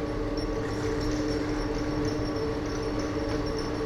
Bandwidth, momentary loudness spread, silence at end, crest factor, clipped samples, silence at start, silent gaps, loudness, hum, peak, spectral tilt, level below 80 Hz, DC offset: 13.5 kHz; 2 LU; 0 s; 12 dB; under 0.1%; 0 s; none; -30 LUFS; none; -16 dBFS; -6 dB/octave; -38 dBFS; under 0.1%